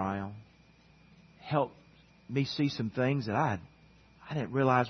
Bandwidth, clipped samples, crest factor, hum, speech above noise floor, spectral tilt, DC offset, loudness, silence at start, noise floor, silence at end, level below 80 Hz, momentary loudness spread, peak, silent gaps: 6.4 kHz; under 0.1%; 22 dB; none; 31 dB; -7 dB/octave; under 0.1%; -32 LUFS; 0 s; -61 dBFS; 0 s; -66 dBFS; 10 LU; -12 dBFS; none